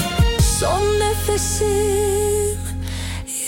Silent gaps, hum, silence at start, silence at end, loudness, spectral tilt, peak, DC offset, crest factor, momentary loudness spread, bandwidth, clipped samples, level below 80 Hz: none; none; 0 s; 0 s; -19 LUFS; -4 dB/octave; -4 dBFS; under 0.1%; 14 dB; 9 LU; 17 kHz; under 0.1%; -26 dBFS